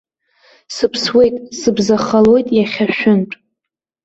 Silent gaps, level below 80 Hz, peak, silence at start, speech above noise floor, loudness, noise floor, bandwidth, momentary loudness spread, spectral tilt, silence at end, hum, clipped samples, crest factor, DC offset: none; -50 dBFS; -2 dBFS; 0.7 s; 69 dB; -14 LUFS; -82 dBFS; 8 kHz; 9 LU; -5 dB/octave; 0.7 s; none; under 0.1%; 14 dB; under 0.1%